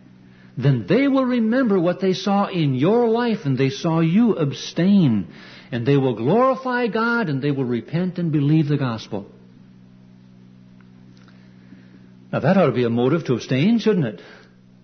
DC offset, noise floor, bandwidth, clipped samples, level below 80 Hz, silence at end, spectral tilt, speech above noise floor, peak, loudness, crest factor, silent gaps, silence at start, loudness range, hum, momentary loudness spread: under 0.1%; -47 dBFS; 6.6 kHz; under 0.1%; -62 dBFS; 0.5 s; -7.5 dB/octave; 28 dB; -4 dBFS; -20 LUFS; 16 dB; none; 0.55 s; 7 LU; none; 8 LU